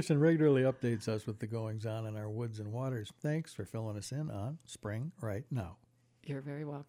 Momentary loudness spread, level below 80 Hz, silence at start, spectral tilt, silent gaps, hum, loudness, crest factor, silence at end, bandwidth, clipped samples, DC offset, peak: 14 LU; -68 dBFS; 0 s; -7 dB/octave; none; none; -36 LUFS; 18 dB; 0.05 s; 15.5 kHz; under 0.1%; under 0.1%; -18 dBFS